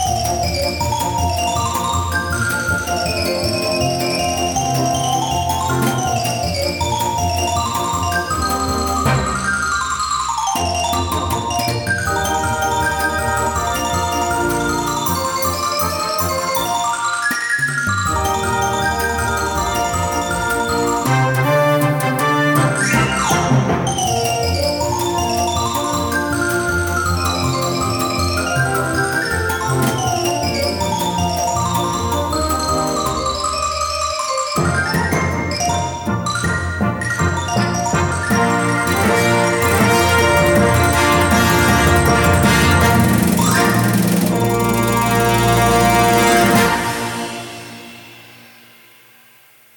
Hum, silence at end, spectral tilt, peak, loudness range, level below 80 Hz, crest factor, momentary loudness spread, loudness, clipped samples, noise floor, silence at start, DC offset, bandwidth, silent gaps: none; 1.3 s; -4 dB/octave; 0 dBFS; 5 LU; -32 dBFS; 16 dB; 6 LU; -17 LUFS; under 0.1%; -48 dBFS; 0 s; under 0.1%; 18 kHz; none